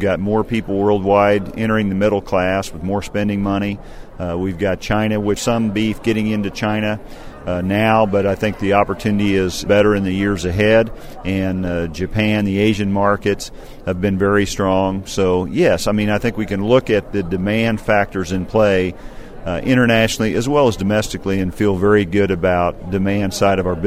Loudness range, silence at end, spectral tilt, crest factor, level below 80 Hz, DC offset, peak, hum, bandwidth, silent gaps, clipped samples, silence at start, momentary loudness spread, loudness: 3 LU; 0 s; -6 dB/octave; 16 dB; -36 dBFS; under 0.1%; 0 dBFS; none; 15.5 kHz; none; under 0.1%; 0 s; 8 LU; -17 LUFS